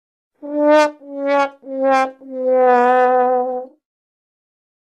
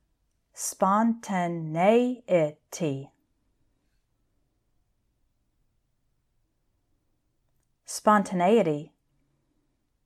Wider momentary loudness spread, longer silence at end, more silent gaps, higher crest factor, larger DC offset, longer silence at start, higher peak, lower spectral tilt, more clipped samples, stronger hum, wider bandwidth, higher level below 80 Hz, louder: about the same, 12 LU vs 11 LU; about the same, 1.3 s vs 1.2 s; neither; second, 16 dB vs 22 dB; neither; about the same, 0.45 s vs 0.55 s; first, -2 dBFS vs -8 dBFS; second, -3 dB/octave vs -5.5 dB/octave; neither; neither; second, 10 kHz vs 15 kHz; about the same, -74 dBFS vs -74 dBFS; first, -16 LUFS vs -25 LUFS